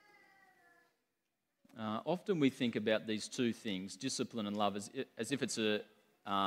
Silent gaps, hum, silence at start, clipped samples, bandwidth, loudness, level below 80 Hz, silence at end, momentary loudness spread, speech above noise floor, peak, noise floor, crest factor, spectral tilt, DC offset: none; none; 1.75 s; under 0.1%; 16 kHz; -38 LUFS; -84 dBFS; 0 s; 9 LU; 50 dB; -18 dBFS; -87 dBFS; 22 dB; -4.5 dB/octave; under 0.1%